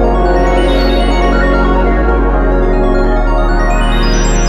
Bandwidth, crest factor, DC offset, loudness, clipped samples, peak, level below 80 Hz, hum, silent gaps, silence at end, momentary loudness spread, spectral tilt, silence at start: 9.4 kHz; 10 dB; under 0.1%; -12 LUFS; under 0.1%; 0 dBFS; -12 dBFS; none; none; 0 s; 2 LU; -5.5 dB/octave; 0 s